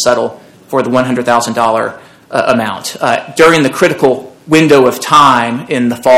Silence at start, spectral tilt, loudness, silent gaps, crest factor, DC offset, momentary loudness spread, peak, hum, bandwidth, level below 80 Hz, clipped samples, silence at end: 0 s; -4.5 dB/octave; -11 LUFS; none; 10 dB; under 0.1%; 10 LU; 0 dBFS; none; 17.5 kHz; -50 dBFS; 3%; 0 s